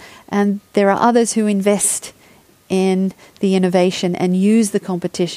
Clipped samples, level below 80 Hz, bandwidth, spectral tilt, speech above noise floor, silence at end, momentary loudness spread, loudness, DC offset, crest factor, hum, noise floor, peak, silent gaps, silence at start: under 0.1%; -62 dBFS; 15.5 kHz; -5 dB/octave; 33 dB; 0 s; 9 LU; -17 LUFS; under 0.1%; 16 dB; none; -49 dBFS; 0 dBFS; none; 0 s